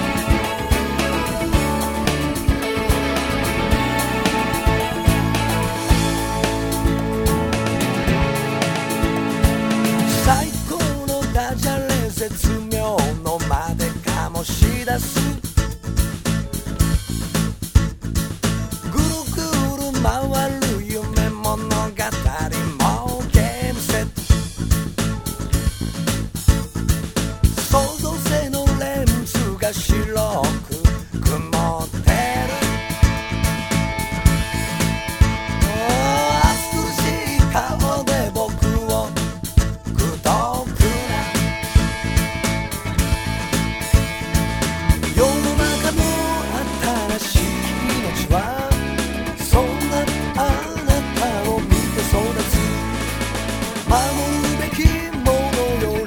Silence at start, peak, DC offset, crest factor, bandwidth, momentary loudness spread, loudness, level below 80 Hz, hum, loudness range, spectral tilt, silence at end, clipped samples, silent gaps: 0 s; -2 dBFS; under 0.1%; 18 dB; over 20 kHz; 5 LU; -20 LUFS; -24 dBFS; none; 2 LU; -5 dB/octave; 0 s; under 0.1%; none